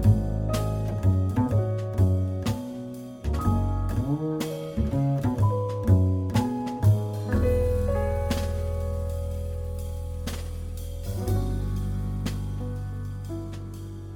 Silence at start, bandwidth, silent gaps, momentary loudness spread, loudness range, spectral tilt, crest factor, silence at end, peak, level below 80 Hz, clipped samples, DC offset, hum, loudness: 0 s; 16.5 kHz; none; 11 LU; 7 LU; -8 dB/octave; 18 dB; 0 s; -8 dBFS; -34 dBFS; under 0.1%; under 0.1%; none; -27 LUFS